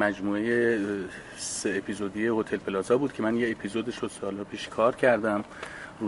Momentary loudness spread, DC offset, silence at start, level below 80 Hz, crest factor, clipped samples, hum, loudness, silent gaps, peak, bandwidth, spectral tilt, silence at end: 11 LU; under 0.1%; 0 s; -60 dBFS; 20 dB; under 0.1%; none; -28 LUFS; none; -8 dBFS; 11.5 kHz; -4.5 dB/octave; 0 s